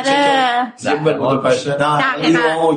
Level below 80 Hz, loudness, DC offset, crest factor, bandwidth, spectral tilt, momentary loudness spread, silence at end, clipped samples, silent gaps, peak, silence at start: -58 dBFS; -15 LUFS; under 0.1%; 12 dB; 10 kHz; -4.5 dB/octave; 4 LU; 0 s; under 0.1%; none; -4 dBFS; 0 s